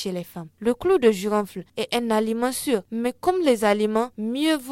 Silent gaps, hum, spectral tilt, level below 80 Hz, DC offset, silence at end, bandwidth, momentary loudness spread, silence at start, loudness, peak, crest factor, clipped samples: none; none; -4.5 dB/octave; -58 dBFS; under 0.1%; 0 s; 17 kHz; 10 LU; 0 s; -23 LUFS; -4 dBFS; 18 dB; under 0.1%